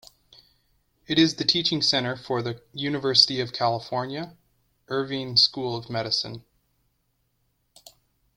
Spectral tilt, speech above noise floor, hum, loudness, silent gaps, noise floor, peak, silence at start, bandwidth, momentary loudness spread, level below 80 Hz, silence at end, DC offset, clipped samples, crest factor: -4 dB/octave; 47 dB; none; -23 LUFS; none; -72 dBFS; -2 dBFS; 1.1 s; 16 kHz; 14 LU; -62 dBFS; 1.95 s; under 0.1%; under 0.1%; 24 dB